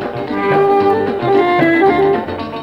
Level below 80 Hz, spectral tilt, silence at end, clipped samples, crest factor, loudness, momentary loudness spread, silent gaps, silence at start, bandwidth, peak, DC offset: -46 dBFS; -7.5 dB/octave; 0 s; under 0.1%; 12 dB; -13 LUFS; 7 LU; none; 0 s; 5.8 kHz; 0 dBFS; under 0.1%